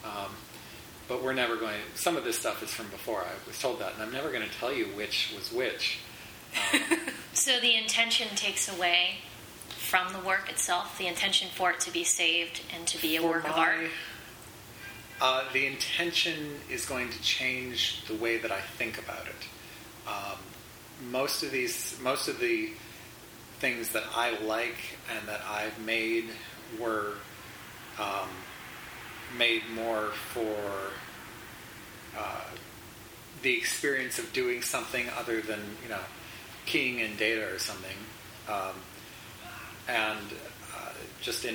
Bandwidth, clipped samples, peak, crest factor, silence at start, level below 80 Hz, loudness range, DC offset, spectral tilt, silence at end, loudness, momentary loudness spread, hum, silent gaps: over 20 kHz; under 0.1%; -8 dBFS; 24 dB; 0 s; -64 dBFS; 8 LU; under 0.1%; -1.5 dB/octave; 0 s; -30 LUFS; 19 LU; none; none